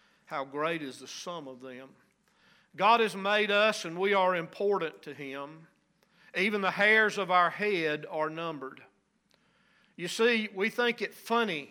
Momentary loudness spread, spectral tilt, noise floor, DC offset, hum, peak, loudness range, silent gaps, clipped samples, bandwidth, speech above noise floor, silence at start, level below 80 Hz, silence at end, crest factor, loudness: 18 LU; -4 dB/octave; -71 dBFS; under 0.1%; none; -12 dBFS; 4 LU; none; under 0.1%; 16.5 kHz; 41 dB; 0.3 s; -86 dBFS; 0.05 s; 20 dB; -28 LUFS